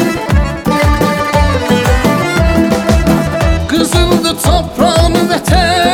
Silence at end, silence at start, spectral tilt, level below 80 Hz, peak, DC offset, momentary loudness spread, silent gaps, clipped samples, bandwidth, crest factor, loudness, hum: 0 s; 0 s; -5 dB/octave; -18 dBFS; 0 dBFS; under 0.1%; 3 LU; none; under 0.1%; 18.5 kHz; 10 dB; -11 LUFS; none